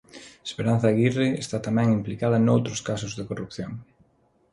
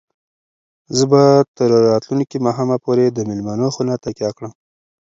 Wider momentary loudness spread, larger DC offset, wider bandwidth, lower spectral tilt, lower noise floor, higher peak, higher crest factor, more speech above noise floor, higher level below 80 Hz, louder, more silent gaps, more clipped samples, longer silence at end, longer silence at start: first, 15 LU vs 12 LU; neither; first, 11.5 kHz vs 7.8 kHz; about the same, -6.5 dB/octave vs -6.5 dB/octave; second, -64 dBFS vs under -90 dBFS; second, -8 dBFS vs 0 dBFS; about the same, 18 dB vs 16 dB; second, 40 dB vs over 75 dB; about the same, -56 dBFS vs -58 dBFS; second, -24 LUFS vs -16 LUFS; second, none vs 1.48-1.54 s; neither; about the same, 0.7 s vs 0.65 s; second, 0.15 s vs 0.9 s